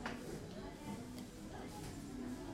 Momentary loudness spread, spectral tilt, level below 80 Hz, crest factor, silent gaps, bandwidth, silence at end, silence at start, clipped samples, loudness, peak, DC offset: 3 LU; -5 dB/octave; -60 dBFS; 18 dB; none; 16 kHz; 0 s; 0 s; under 0.1%; -49 LUFS; -30 dBFS; under 0.1%